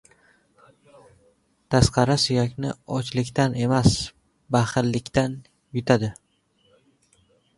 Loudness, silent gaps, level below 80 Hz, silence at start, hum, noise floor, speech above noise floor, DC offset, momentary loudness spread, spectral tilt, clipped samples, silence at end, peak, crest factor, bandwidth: -23 LUFS; none; -42 dBFS; 1.7 s; none; -65 dBFS; 44 dB; under 0.1%; 11 LU; -5.5 dB/octave; under 0.1%; 1.45 s; -2 dBFS; 24 dB; 11.5 kHz